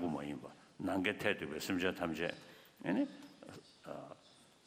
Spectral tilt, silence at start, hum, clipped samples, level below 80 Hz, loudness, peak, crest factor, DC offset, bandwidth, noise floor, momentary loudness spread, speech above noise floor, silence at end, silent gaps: -5 dB/octave; 0 s; none; under 0.1%; -72 dBFS; -39 LUFS; -18 dBFS; 24 dB; under 0.1%; 15.5 kHz; -65 dBFS; 19 LU; 27 dB; 0.2 s; none